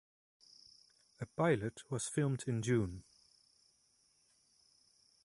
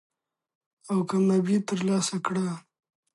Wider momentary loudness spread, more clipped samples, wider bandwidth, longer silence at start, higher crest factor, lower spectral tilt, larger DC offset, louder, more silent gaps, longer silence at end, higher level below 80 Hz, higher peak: first, 24 LU vs 7 LU; neither; about the same, 11.5 kHz vs 11.5 kHz; first, 1.2 s vs 0.85 s; first, 22 dB vs 16 dB; about the same, -6 dB/octave vs -6 dB/octave; neither; second, -37 LUFS vs -26 LUFS; neither; first, 2.25 s vs 0.55 s; first, -66 dBFS vs -74 dBFS; second, -20 dBFS vs -12 dBFS